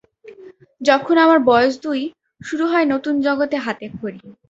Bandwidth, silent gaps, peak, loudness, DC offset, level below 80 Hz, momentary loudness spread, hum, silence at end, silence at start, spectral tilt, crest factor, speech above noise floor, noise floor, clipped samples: 8 kHz; none; -2 dBFS; -17 LUFS; under 0.1%; -60 dBFS; 17 LU; none; 0.2 s; 0.25 s; -5 dB/octave; 18 dB; 26 dB; -43 dBFS; under 0.1%